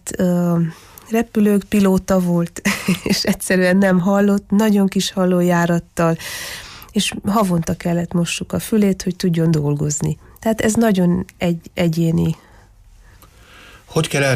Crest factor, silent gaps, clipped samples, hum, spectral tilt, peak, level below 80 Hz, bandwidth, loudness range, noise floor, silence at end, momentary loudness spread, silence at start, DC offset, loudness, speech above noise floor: 12 dB; none; under 0.1%; none; -5.5 dB/octave; -6 dBFS; -44 dBFS; 15.5 kHz; 4 LU; -46 dBFS; 0 s; 7 LU; 0.05 s; under 0.1%; -18 LUFS; 29 dB